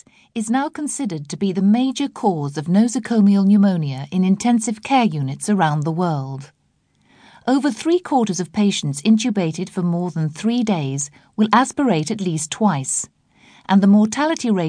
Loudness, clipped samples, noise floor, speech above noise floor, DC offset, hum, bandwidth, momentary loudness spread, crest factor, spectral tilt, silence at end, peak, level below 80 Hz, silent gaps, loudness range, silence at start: -19 LUFS; under 0.1%; -62 dBFS; 44 dB; under 0.1%; none; 10.5 kHz; 9 LU; 18 dB; -5.5 dB/octave; 0 s; 0 dBFS; -64 dBFS; none; 4 LU; 0.35 s